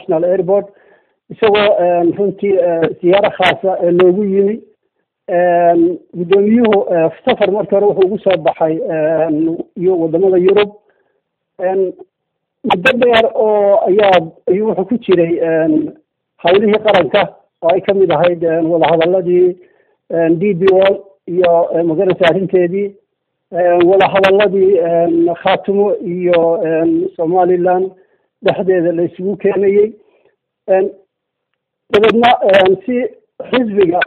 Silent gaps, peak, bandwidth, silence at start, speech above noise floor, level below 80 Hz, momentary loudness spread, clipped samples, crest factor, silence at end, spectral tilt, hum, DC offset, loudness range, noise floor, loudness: none; 0 dBFS; 6.2 kHz; 0.1 s; 61 dB; -54 dBFS; 8 LU; under 0.1%; 12 dB; 0 s; -7.5 dB/octave; none; under 0.1%; 3 LU; -73 dBFS; -13 LUFS